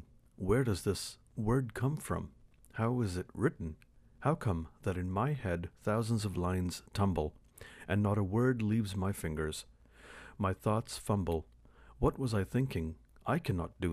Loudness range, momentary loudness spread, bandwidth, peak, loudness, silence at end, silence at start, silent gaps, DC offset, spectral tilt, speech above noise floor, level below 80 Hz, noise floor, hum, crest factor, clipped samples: 2 LU; 12 LU; 15.5 kHz; -16 dBFS; -35 LUFS; 0 s; 0 s; none; under 0.1%; -6.5 dB/octave; 21 dB; -52 dBFS; -55 dBFS; none; 18 dB; under 0.1%